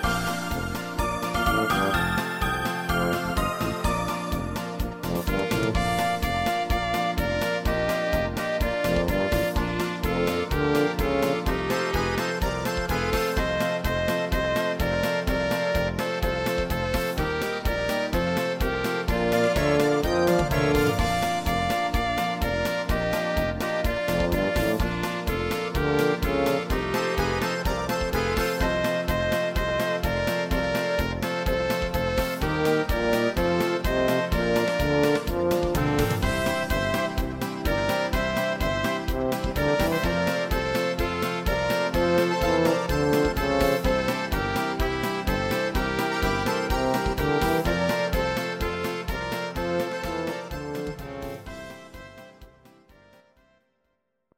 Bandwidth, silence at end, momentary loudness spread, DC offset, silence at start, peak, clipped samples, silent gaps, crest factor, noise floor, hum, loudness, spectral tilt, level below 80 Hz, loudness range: 17 kHz; 1.9 s; 6 LU; under 0.1%; 0 s; -10 dBFS; under 0.1%; none; 16 dB; -75 dBFS; none; -25 LUFS; -5.5 dB/octave; -34 dBFS; 3 LU